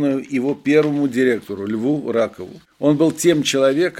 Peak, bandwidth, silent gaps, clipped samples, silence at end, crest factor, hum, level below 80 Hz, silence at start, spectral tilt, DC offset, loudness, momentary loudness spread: -2 dBFS; 16 kHz; none; under 0.1%; 0 s; 16 dB; none; -62 dBFS; 0 s; -5 dB/octave; under 0.1%; -18 LUFS; 8 LU